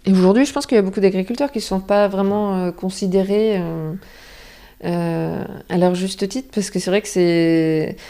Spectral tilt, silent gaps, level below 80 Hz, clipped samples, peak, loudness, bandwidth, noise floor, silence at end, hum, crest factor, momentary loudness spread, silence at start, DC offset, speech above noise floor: -6 dB/octave; none; -48 dBFS; under 0.1%; -2 dBFS; -19 LUFS; 15 kHz; -42 dBFS; 0 s; none; 16 dB; 9 LU; 0.05 s; under 0.1%; 24 dB